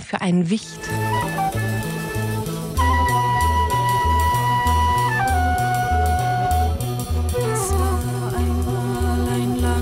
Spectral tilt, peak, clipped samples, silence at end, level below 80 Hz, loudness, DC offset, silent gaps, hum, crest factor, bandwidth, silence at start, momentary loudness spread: -5.5 dB/octave; -8 dBFS; under 0.1%; 0 s; -28 dBFS; -21 LUFS; under 0.1%; none; none; 12 dB; 16.5 kHz; 0 s; 6 LU